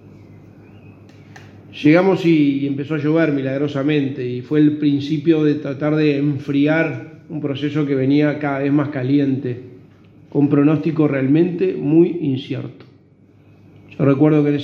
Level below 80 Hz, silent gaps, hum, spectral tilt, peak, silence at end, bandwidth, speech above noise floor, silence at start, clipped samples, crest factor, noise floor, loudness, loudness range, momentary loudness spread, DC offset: -64 dBFS; none; none; -9 dB/octave; 0 dBFS; 0 s; 6.4 kHz; 33 dB; 0.05 s; under 0.1%; 18 dB; -50 dBFS; -17 LUFS; 2 LU; 10 LU; under 0.1%